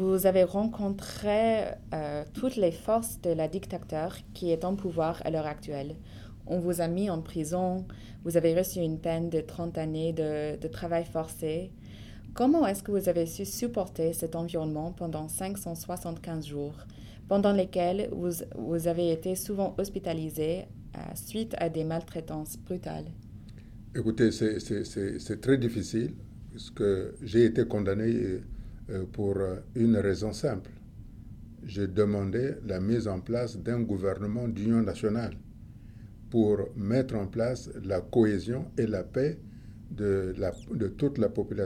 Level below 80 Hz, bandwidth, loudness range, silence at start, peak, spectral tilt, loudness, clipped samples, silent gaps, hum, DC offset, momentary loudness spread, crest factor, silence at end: -50 dBFS; 17 kHz; 4 LU; 0 s; -10 dBFS; -6.5 dB/octave; -30 LUFS; under 0.1%; none; none; under 0.1%; 18 LU; 20 dB; 0 s